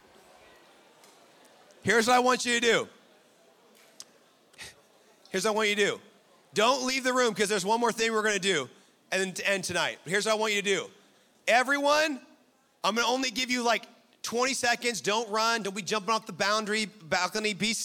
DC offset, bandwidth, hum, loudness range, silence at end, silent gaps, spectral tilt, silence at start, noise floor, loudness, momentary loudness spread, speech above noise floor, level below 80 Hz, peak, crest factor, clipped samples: under 0.1%; 17 kHz; none; 4 LU; 0 s; none; -2 dB/octave; 1.85 s; -64 dBFS; -27 LUFS; 10 LU; 37 dB; -72 dBFS; -10 dBFS; 20 dB; under 0.1%